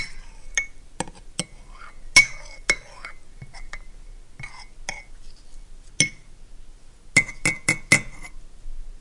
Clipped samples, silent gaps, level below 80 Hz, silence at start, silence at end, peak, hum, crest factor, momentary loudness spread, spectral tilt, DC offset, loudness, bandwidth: under 0.1%; none; -40 dBFS; 0 s; 0 s; -2 dBFS; none; 26 dB; 26 LU; -1.5 dB/octave; under 0.1%; -22 LUFS; 11.5 kHz